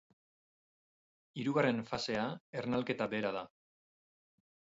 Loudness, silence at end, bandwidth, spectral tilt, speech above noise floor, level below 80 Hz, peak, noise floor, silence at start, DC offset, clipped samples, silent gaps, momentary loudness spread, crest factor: -36 LUFS; 1.3 s; 7.6 kHz; -4.5 dB/octave; over 55 dB; -72 dBFS; -18 dBFS; under -90 dBFS; 1.35 s; under 0.1%; under 0.1%; 2.40-2.53 s; 11 LU; 20 dB